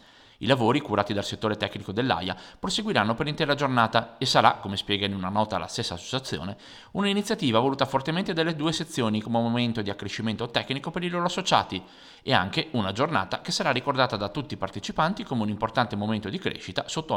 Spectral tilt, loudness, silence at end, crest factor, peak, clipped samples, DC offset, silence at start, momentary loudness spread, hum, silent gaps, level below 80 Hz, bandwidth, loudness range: -5 dB/octave; -26 LUFS; 0 s; 24 dB; -4 dBFS; under 0.1%; under 0.1%; 0.4 s; 9 LU; none; none; -56 dBFS; 16.5 kHz; 3 LU